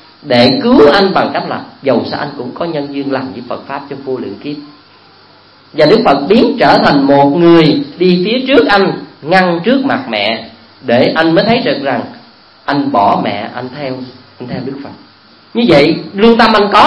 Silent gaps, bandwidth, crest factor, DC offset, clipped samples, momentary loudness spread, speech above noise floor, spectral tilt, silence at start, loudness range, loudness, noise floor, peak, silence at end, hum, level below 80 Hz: none; 11 kHz; 12 dB; under 0.1%; 0.6%; 16 LU; 32 dB; -7 dB/octave; 0.25 s; 9 LU; -10 LUFS; -42 dBFS; 0 dBFS; 0 s; none; -44 dBFS